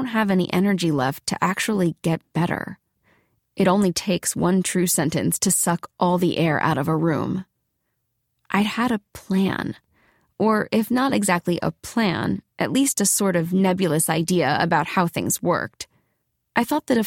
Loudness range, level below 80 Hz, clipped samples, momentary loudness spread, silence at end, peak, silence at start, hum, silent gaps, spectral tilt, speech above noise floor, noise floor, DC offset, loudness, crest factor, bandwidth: 4 LU; -56 dBFS; under 0.1%; 7 LU; 0 s; -4 dBFS; 0 s; none; none; -4.5 dB/octave; 53 dB; -74 dBFS; under 0.1%; -21 LUFS; 18 dB; 18 kHz